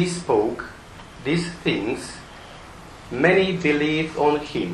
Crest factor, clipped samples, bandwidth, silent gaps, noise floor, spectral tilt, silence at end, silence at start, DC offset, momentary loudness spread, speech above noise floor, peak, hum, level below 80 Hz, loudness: 22 dB; under 0.1%; 12 kHz; none; -41 dBFS; -5.5 dB/octave; 0 s; 0 s; under 0.1%; 22 LU; 20 dB; -2 dBFS; none; -48 dBFS; -22 LUFS